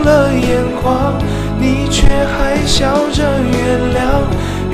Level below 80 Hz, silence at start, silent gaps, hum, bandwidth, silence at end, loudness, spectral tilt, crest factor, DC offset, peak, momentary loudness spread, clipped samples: -20 dBFS; 0 s; none; none; 15 kHz; 0 s; -14 LUFS; -5.5 dB/octave; 12 dB; under 0.1%; 0 dBFS; 3 LU; 0.3%